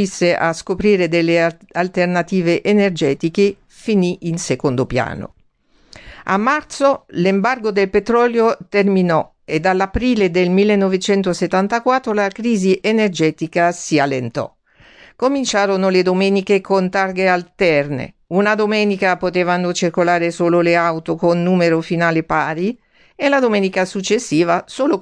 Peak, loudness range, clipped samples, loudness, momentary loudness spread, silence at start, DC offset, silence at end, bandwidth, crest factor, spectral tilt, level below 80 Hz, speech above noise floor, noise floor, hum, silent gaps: -2 dBFS; 3 LU; under 0.1%; -16 LUFS; 6 LU; 0 s; under 0.1%; 0 s; 10 kHz; 14 dB; -5.5 dB/octave; -46 dBFS; 39 dB; -55 dBFS; none; none